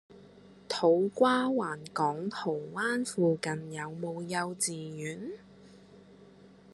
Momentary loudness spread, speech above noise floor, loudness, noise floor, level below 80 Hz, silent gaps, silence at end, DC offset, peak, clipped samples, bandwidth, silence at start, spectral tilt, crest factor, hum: 13 LU; 25 dB; -31 LUFS; -55 dBFS; -74 dBFS; none; 0.25 s; under 0.1%; -12 dBFS; under 0.1%; 12.5 kHz; 0.1 s; -4.5 dB/octave; 20 dB; none